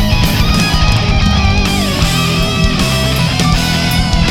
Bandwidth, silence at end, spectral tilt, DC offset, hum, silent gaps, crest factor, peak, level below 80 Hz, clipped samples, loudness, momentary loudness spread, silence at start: 17.5 kHz; 0 s; -4.5 dB/octave; under 0.1%; none; none; 12 dB; 0 dBFS; -16 dBFS; under 0.1%; -12 LUFS; 1 LU; 0 s